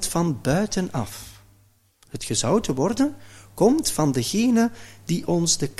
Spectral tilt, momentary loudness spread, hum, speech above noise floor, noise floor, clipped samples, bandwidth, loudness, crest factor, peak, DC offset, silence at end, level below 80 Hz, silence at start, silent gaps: -4.5 dB/octave; 16 LU; none; 36 dB; -59 dBFS; under 0.1%; 15.5 kHz; -22 LUFS; 18 dB; -6 dBFS; under 0.1%; 0.05 s; -46 dBFS; 0 s; none